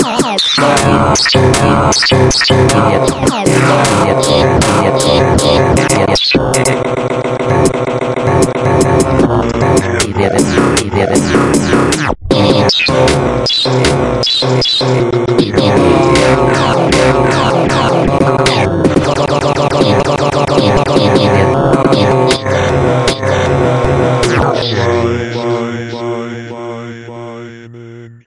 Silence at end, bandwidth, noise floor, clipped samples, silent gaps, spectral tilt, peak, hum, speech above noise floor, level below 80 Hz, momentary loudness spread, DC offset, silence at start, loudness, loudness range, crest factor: 0.1 s; 11.5 kHz; -31 dBFS; 0.1%; none; -5 dB/octave; 0 dBFS; none; 22 dB; -30 dBFS; 6 LU; under 0.1%; 0 s; -10 LUFS; 3 LU; 10 dB